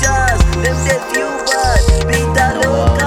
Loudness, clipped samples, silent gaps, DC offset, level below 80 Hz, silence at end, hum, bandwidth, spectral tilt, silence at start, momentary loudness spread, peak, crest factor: -14 LUFS; under 0.1%; none; under 0.1%; -18 dBFS; 0 s; none; 17 kHz; -4.5 dB/octave; 0 s; 3 LU; 0 dBFS; 12 dB